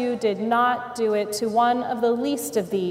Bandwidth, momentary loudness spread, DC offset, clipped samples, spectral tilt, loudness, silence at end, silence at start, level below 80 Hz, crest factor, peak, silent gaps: 16 kHz; 4 LU; under 0.1%; under 0.1%; -4.5 dB/octave; -23 LUFS; 0 s; 0 s; -66 dBFS; 12 dB; -10 dBFS; none